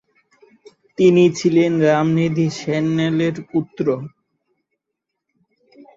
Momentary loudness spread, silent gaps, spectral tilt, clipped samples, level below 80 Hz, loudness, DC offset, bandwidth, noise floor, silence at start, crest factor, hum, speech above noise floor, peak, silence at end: 10 LU; none; -7 dB/octave; under 0.1%; -60 dBFS; -17 LUFS; under 0.1%; 7.8 kHz; -80 dBFS; 1 s; 16 dB; none; 63 dB; -2 dBFS; 1.9 s